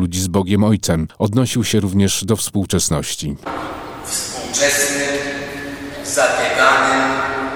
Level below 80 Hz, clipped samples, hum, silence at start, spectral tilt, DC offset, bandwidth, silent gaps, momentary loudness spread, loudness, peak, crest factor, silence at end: -40 dBFS; under 0.1%; none; 0 s; -4 dB/octave; under 0.1%; 18.5 kHz; none; 12 LU; -17 LUFS; 0 dBFS; 18 dB; 0 s